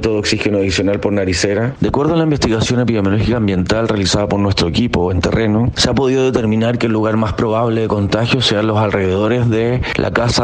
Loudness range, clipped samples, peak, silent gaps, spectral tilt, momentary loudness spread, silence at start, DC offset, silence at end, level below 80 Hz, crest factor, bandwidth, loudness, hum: 0 LU; under 0.1%; 0 dBFS; none; -5.5 dB/octave; 2 LU; 0 s; under 0.1%; 0 s; -34 dBFS; 14 dB; 10 kHz; -15 LUFS; none